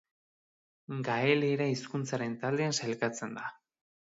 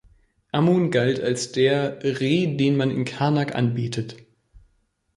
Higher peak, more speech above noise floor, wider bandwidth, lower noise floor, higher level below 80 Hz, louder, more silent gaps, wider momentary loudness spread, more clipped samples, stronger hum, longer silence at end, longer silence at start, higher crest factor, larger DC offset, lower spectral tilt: second, -12 dBFS vs -6 dBFS; first, over 58 dB vs 46 dB; second, 7.8 kHz vs 11.5 kHz; first, under -90 dBFS vs -67 dBFS; second, -78 dBFS vs -58 dBFS; second, -32 LUFS vs -22 LUFS; neither; first, 12 LU vs 8 LU; neither; neither; second, 0.65 s vs 1 s; first, 0.9 s vs 0.55 s; about the same, 20 dB vs 18 dB; neither; about the same, -5 dB/octave vs -6 dB/octave